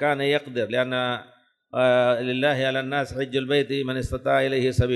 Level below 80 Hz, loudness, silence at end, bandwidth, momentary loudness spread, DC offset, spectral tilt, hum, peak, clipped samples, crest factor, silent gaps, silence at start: -44 dBFS; -23 LUFS; 0 s; 12 kHz; 6 LU; under 0.1%; -6 dB/octave; none; -8 dBFS; under 0.1%; 16 dB; none; 0 s